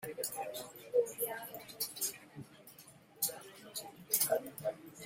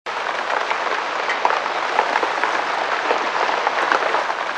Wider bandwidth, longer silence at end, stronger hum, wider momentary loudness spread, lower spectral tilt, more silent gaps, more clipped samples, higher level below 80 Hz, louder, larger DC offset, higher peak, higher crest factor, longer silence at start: first, 16.5 kHz vs 11 kHz; about the same, 0 s vs 0 s; neither; first, 21 LU vs 3 LU; about the same, -1.5 dB/octave vs -1.5 dB/octave; neither; neither; about the same, -80 dBFS vs -76 dBFS; second, -37 LUFS vs -20 LUFS; neither; second, -12 dBFS vs 0 dBFS; first, 28 dB vs 20 dB; about the same, 0 s vs 0.05 s